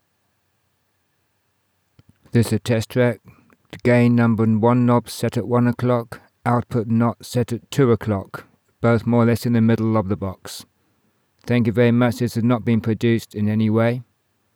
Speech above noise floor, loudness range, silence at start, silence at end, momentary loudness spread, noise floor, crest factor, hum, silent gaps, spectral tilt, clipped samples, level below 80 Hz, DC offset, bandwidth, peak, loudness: 50 dB; 3 LU; 2.35 s; 0.55 s; 10 LU; -68 dBFS; 16 dB; none; none; -7.5 dB/octave; under 0.1%; -56 dBFS; under 0.1%; 16.5 kHz; -4 dBFS; -19 LUFS